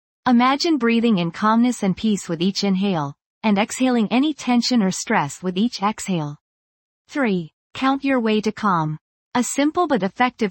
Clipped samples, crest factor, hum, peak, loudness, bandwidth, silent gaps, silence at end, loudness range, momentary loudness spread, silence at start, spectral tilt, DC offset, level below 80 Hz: under 0.1%; 16 dB; none; -4 dBFS; -20 LUFS; 17 kHz; 3.26-3.41 s, 6.41-7.05 s, 7.53-7.70 s, 9.01-9.31 s; 0 s; 3 LU; 8 LU; 0.25 s; -5 dB/octave; under 0.1%; -60 dBFS